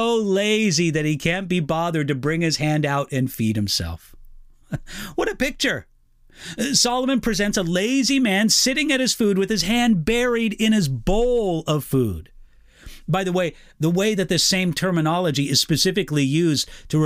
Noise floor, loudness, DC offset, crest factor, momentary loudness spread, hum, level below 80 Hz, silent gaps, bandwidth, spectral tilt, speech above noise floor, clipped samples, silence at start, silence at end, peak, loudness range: -47 dBFS; -20 LUFS; under 0.1%; 16 dB; 8 LU; none; -40 dBFS; none; 16.5 kHz; -4 dB/octave; 27 dB; under 0.1%; 0 s; 0 s; -6 dBFS; 5 LU